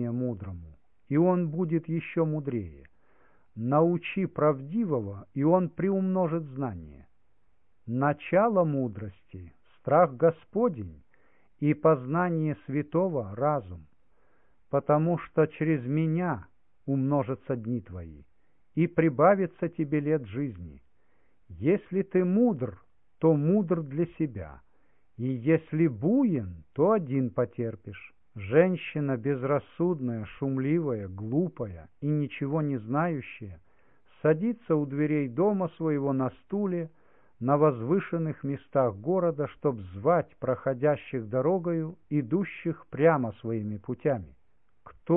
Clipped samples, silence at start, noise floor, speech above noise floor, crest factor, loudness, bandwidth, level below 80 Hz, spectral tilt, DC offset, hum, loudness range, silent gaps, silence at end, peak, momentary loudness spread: under 0.1%; 0 s; -72 dBFS; 45 dB; 20 dB; -28 LUFS; 3.7 kHz; -62 dBFS; -12.5 dB/octave; 0.1%; none; 3 LU; none; 0 s; -8 dBFS; 13 LU